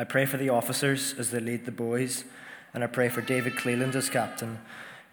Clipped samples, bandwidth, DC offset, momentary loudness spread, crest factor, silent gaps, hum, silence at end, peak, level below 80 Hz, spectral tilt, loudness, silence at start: under 0.1%; over 20 kHz; under 0.1%; 14 LU; 18 dB; none; none; 0.1 s; -12 dBFS; -76 dBFS; -4 dB/octave; -28 LUFS; 0 s